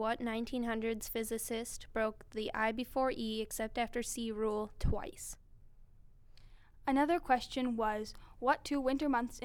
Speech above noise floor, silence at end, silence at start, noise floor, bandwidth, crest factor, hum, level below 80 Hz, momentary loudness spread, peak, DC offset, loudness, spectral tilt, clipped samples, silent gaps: 22 dB; 0 s; 0 s; -58 dBFS; over 20 kHz; 20 dB; none; -50 dBFS; 8 LU; -16 dBFS; under 0.1%; -36 LUFS; -4.5 dB/octave; under 0.1%; none